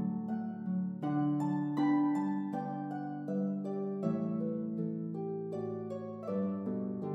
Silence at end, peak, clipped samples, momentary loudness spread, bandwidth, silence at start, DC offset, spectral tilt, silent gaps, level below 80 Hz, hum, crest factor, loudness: 0 s; -22 dBFS; under 0.1%; 8 LU; 7.6 kHz; 0 s; under 0.1%; -10 dB/octave; none; -86 dBFS; none; 14 dB; -35 LUFS